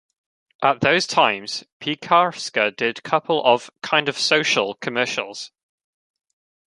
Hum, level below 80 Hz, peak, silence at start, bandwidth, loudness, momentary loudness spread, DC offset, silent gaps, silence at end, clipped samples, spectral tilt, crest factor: none; -66 dBFS; -2 dBFS; 0.6 s; 11.5 kHz; -20 LUFS; 10 LU; under 0.1%; 1.72-1.80 s; 1.3 s; under 0.1%; -3 dB/octave; 20 dB